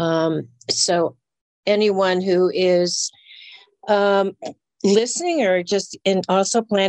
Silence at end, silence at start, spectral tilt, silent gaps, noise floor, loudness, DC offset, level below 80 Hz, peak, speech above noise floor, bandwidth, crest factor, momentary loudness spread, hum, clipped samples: 0 s; 0 s; -4 dB/octave; 1.41-1.63 s; -45 dBFS; -19 LUFS; under 0.1%; -70 dBFS; -4 dBFS; 26 dB; 10 kHz; 14 dB; 9 LU; none; under 0.1%